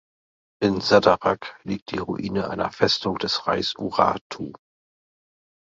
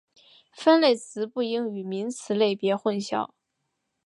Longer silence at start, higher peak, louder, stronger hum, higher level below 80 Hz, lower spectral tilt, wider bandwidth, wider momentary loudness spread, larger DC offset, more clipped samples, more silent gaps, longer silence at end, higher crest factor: about the same, 0.6 s vs 0.55 s; first, -2 dBFS vs -8 dBFS; about the same, -23 LUFS vs -25 LUFS; neither; first, -54 dBFS vs -78 dBFS; about the same, -5 dB/octave vs -5 dB/octave; second, 7.8 kHz vs 11.5 kHz; about the same, 14 LU vs 12 LU; neither; neither; first, 1.82-1.86 s, 4.21-4.30 s vs none; first, 1.2 s vs 0.8 s; about the same, 22 dB vs 18 dB